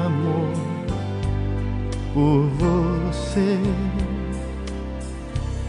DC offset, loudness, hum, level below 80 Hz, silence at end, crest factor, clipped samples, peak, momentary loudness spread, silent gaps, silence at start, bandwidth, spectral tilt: under 0.1%; -24 LUFS; none; -30 dBFS; 0 s; 14 dB; under 0.1%; -8 dBFS; 11 LU; none; 0 s; 10.5 kHz; -7.5 dB/octave